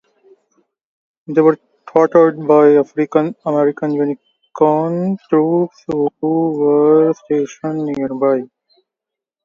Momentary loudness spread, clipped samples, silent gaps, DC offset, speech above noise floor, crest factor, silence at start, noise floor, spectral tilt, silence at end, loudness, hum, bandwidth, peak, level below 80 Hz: 10 LU; under 0.1%; none; under 0.1%; 70 dB; 16 dB; 1.3 s; -84 dBFS; -8.5 dB/octave; 1 s; -15 LUFS; none; 7 kHz; 0 dBFS; -62 dBFS